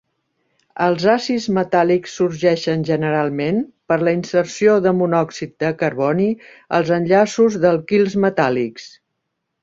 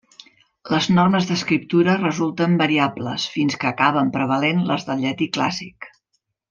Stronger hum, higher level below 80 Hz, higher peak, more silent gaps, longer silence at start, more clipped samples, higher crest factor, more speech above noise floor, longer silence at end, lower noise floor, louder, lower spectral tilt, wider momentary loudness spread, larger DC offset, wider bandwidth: neither; about the same, -58 dBFS vs -60 dBFS; about the same, -2 dBFS vs -2 dBFS; neither; about the same, 0.75 s vs 0.65 s; neither; about the same, 16 dB vs 18 dB; first, 58 dB vs 53 dB; about the same, 0.75 s vs 0.65 s; about the same, -75 dBFS vs -73 dBFS; about the same, -18 LUFS vs -20 LUFS; about the same, -6 dB/octave vs -5.5 dB/octave; about the same, 7 LU vs 7 LU; neither; about the same, 7.8 kHz vs 7.4 kHz